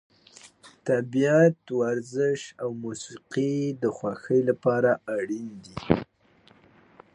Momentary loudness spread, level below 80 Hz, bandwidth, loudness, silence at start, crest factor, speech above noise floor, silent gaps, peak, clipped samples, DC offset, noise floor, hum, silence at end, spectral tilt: 14 LU; -58 dBFS; 11 kHz; -26 LUFS; 0.45 s; 24 dB; 34 dB; none; -4 dBFS; under 0.1%; under 0.1%; -60 dBFS; none; 1.1 s; -6.5 dB/octave